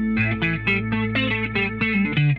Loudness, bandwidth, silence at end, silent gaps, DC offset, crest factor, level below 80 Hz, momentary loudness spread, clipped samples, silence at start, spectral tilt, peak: -21 LUFS; 5.6 kHz; 0 s; none; under 0.1%; 14 dB; -40 dBFS; 2 LU; under 0.1%; 0 s; -8.5 dB/octave; -8 dBFS